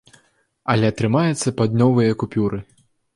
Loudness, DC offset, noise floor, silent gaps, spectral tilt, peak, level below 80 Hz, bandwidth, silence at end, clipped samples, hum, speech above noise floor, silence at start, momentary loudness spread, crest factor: -19 LUFS; under 0.1%; -60 dBFS; none; -6.5 dB/octave; -4 dBFS; -50 dBFS; 11.5 kHz; 0.55 s; under 0.1%; none; 42 dB; 0.65 s; 8 LU; 16 dB